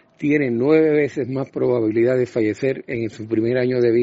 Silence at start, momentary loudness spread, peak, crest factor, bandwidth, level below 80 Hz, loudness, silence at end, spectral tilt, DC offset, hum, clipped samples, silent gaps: 0.2 s; 9 LU; -6 dBFS; 14 dB; 7.8 kHz; -60 dBFS; -20 LUFS; 0 s; -7 dB/octave; under 0.1%; none; under 0.1%; none